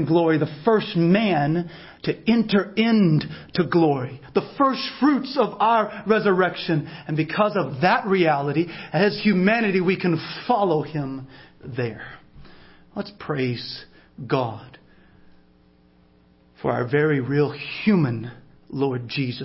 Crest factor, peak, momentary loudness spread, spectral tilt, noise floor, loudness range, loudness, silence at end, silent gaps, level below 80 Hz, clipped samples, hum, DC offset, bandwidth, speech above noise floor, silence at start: 16 dB; -6 dBFS; 13 LU; -10.5 dB/octave; -56 dBFS; 10 LU; -22 LUFS; 0 s; none; -58 dBFS; under 0.1%; none; under 0.1%; 5.8 kHz; 35 dB; 0 s